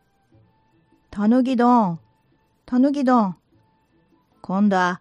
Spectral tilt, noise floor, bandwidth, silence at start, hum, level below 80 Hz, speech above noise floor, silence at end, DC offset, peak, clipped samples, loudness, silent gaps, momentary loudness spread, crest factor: -7.5 dB/octave; -63 dBFS; 8 kHz; 1.1 s; none; -62 dBFS; 45 dB; 0.05 s; under 0.1%; -6 dBFS; under 0.1%; -19 LUFS; none; 19 LU; 16 dB